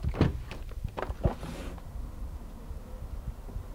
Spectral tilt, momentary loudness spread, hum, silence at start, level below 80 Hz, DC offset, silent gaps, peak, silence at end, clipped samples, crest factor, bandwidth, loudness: -7.5 dB/octave; 14 LU; none; 0 s; -38 dBFS; under 0.1%; none; -12 dBFS; 0 s; under 0.1%; 22 dB; 16.5 kHz; -37 LUFS